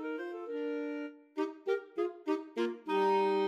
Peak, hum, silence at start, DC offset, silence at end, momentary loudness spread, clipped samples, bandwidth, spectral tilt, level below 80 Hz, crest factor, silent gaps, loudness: -20 dBFS; none; 0 s; under 0.1%; 0 s; 11 LU; under 0.1%; 9.2 kHz; -6 dB/octave; under -90 dBFS; 14 dB; none; -35 LUFS